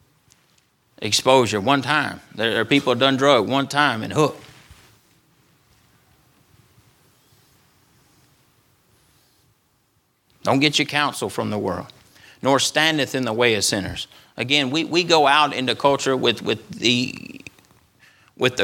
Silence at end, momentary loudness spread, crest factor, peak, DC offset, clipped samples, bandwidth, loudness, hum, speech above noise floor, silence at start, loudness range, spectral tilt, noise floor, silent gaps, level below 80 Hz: 0 s; 13 LU; 22 dB; 0 dBFS; under 0.1%; under 0.1%; 17.5 kHz; -19 LUFS; none; 45 dB; 1 s; 7 LU; -3.5 dB/octave; -65 dBFS; none; -62 dBFS